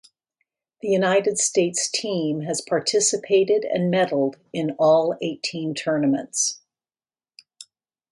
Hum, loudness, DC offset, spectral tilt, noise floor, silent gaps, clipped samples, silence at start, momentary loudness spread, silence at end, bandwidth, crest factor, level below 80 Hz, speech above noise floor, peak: none; -22 LUFS; under 0.1%; -3.5 dB/octave; under -90 dBFS; none; under 0.1%; 0.85 s; 8 LU; 0.5 s; 11.5 kHz; 16 dB; -72 dBFS; over 68 dB; -8 dBFS